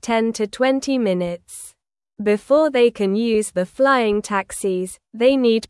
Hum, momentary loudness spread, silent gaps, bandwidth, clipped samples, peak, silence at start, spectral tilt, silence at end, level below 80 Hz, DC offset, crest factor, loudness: none; 11 LU; none; 12 kHz; under 0.1%; -4 dBFS; 0.05 s; -5 dB/octave; 0.05 s; -56 dBFS; under 0.1%; 16 dB; -19 LUFS